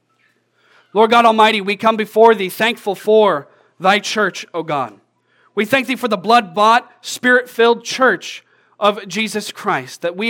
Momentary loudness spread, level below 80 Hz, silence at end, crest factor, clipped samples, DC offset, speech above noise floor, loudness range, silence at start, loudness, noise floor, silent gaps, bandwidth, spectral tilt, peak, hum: 11 LU; -72 dBFS; 0 s; 16 dB; under 0.1%; under 0.1%; 46 dB; 4 LU; 0.95 s; -15 LUFS; -61 dBFS; none; 17.5 kHz; -3.5 dB/octave; 0 dBFS; none